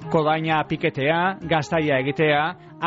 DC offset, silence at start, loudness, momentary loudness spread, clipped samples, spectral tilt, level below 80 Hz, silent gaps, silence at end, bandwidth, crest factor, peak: under 0.1%; 0 s; -22 LUFS; 4 LU; under 0.1%; -4 dB/octave; -54 dBFS; none; 0 s; 7.8 kHz; 14 dB; -8 dBFS